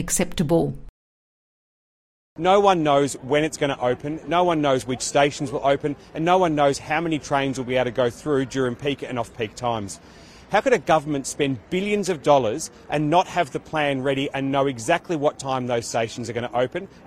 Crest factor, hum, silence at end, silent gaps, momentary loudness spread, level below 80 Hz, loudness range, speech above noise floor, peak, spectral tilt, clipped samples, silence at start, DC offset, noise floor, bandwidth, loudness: 20 dB; none; 0.1 s; 0.89-2.36 s; 8 LU; -50 dBFS; 3 LU; over 68 dB; -2 dBFS; -4.5 dB/octave; under 0.1%; 0 s; under 0.1%; under -90 dBFS; 16 kHz; -22 LUFS